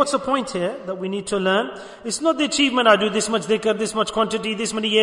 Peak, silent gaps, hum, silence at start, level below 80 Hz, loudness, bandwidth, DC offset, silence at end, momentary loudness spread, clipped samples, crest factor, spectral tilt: -2 dBFS; none; none; 0 s; -58 dBFS; -21 LUFS; 11 kHz; under 0.1%; 0 s; 11 LU; under 0.1%; 18 dB; -3 dB/octave